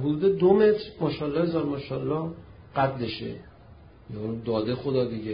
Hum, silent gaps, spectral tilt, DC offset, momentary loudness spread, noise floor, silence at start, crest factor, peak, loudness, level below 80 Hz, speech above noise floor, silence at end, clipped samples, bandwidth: none; none; -11.5 dB/octave; under 0.1%; 16 LU; -50 dBFS; 0 s; 18 dB; -8 dBFS; -26 LUFS; -54 dBFS; 25 dB; 0 s; under 0.1%; 5.2 kHz